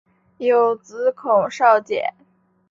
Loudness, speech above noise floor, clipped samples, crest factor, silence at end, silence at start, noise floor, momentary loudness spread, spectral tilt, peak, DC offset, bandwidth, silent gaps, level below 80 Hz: -19 LUFS; 41 dB; under 0.1%; 18 dB; 0.6 s; 0.4 s; -59 dBFS; 9 LU; -4.5 dB/octave; -2 dBFS; under 0.1%; 7.6 kHz; none; -68 dBFS